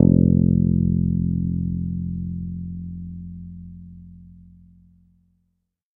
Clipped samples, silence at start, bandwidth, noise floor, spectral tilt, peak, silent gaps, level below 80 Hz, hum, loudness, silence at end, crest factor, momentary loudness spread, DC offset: under 0.1%; 0 s; 1 kHz; -72 dBFS; -16 dB/octave; 0 dBFS; none; -38 dBFS; none; -22 LUFS; 1.65 s; 22 dB; 23 LU; under 0.1%